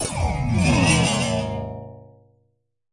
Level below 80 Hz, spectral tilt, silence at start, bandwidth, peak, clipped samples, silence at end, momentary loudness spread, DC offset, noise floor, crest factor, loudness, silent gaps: -36 dBFS; -4.5 dB/octave; 0 s; 11.5 kHz; -6 dBFS; under 0.1%; 0.9 s; 18 LU; under 0.1%; -70 dBFS; 18 dB; -21 LUFS; none